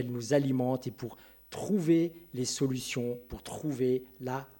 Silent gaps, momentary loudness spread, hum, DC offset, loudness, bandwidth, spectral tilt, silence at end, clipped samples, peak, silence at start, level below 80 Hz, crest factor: none; 14 LU; none; under 0.1%; -32 LUFS; 16.5 kHz; -5.5 dB/octave; 0.15 s; under 0.1%; -12 dBFS; 0 s; -60 dBFS; 18 dB